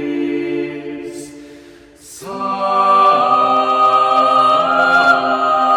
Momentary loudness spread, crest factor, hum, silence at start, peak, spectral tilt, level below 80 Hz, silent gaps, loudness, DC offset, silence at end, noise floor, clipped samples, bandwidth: 18 LU; 14 dB; none; 0 s; 0 dBFS; -4 dB/octave; -60 dBFS; none; -13 LUFS; under 0.1%; 0 s; -41 dBFS; under 0.1%; 13 kHz